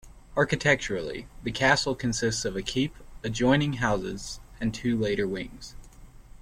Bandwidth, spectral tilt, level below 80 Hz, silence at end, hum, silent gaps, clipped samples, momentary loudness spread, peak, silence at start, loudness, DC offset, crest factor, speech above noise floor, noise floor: 15.5 kHz; -4.5 dB/octave; -46 dBFS; 0 s; none; none; under 0.1%; 14 LU; -8 dBFS; 0.05 s; -27 LUFS; under 0.1%; 20 dB; 21 dB; -48 dBFS